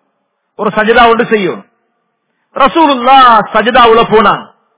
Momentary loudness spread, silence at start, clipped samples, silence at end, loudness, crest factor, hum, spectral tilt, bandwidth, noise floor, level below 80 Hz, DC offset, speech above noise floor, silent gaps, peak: 13 LU; 0.6 s; 5%; 0.35 s; -7 LUFS; 8 dB; none; -8 dB/octave; 4 kHz; -64 dBFS; -40 dBFS; under 0.1%; 57 dB; none; 0 dBFS